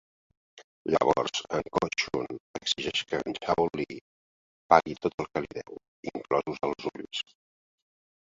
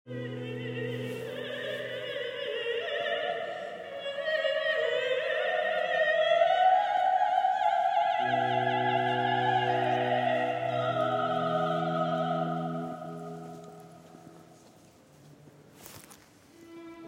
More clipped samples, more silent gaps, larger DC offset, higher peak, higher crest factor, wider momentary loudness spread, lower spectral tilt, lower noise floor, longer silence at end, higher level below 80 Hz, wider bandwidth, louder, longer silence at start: neither; first, 0.64-0.85 s, 2.40-2.54 s, 4.01-4.69 s, 5.14-5.18 s, 5.88-6.03 s vs none; neither; first, -2 dBFS vs -12 dBFS; first, 28 dB vs 18 dB; about the same, 16 LU vs 14 LU; second, -4 dB/octave vs -5.5 dB/octave; first, under -90 dBFS vs -57 dBFS; first, 1.15 s vs 0 s; first, -60 dBFS vs -78 dBFS; second, 7.8 kHz vs 16 kHz; about the same, -29 LUFS vs -29 LUFS; first, 0.55 s vs 0.05 s